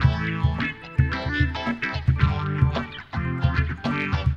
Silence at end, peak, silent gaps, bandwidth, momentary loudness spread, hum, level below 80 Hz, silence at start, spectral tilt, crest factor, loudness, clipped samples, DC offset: 0 s; -6 dBFS; none; 6.8 kHz; 5 LU; none; -30 dBFS; 0 s; -7.5 dB/octave; 18 dB; -25 LUFS; under 0.1%; under 0.1%